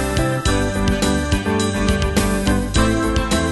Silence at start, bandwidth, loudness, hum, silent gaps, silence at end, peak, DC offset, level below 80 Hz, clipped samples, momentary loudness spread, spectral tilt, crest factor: 0 s; 12.5 kHz; -18 LUFS; none; none; 0 s; -4 dBFS; under 0.1%; -24 dBFS; under 0.1%; 2 LU; -5 dB/octave; 14 dB